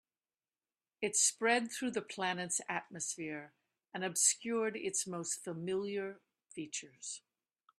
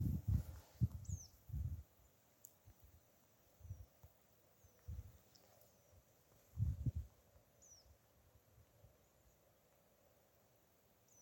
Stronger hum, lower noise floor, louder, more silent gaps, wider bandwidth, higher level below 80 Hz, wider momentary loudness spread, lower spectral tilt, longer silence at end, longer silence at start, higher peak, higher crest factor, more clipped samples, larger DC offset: neither; first, under -90 dBFS vs -74 dBFS; first, -35 LUFS vs -47 LUFS; neither; second, 15 kHz vs 17 kHz; second, -84 dBFS vs -56 dBFS; second, 15 LU vs 25 LU; second, -2 dB/octave vs -7 dB/octave; first, 0.6 s vs 0 s; first, 1 s vs 0 s; first, -16 dBFS vs -26 dBFS; about the same, 22 dB vs 24 dB; neither; neither